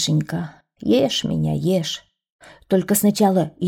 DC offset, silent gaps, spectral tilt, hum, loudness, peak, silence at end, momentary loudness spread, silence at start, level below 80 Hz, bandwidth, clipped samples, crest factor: under 0.1%; 2.32-2.39 s; -5 dB/octave; none; -20 LUFS; -4 dBFS; 0 s; 12 LU; 0 s; -52 dBFS; 18.5 kHz; under 0.1%; 16 dB